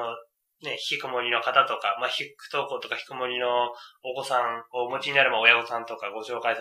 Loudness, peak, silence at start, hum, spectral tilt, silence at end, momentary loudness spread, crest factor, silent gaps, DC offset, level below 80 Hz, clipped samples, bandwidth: -25 LUFS; -2 dBFS; 0 s; none; -2.5 dB/octave; 0 s; 15 LU; 26 dB; none; under 0.1%; -82 dBFS; under 0.1%; 15.5 kHz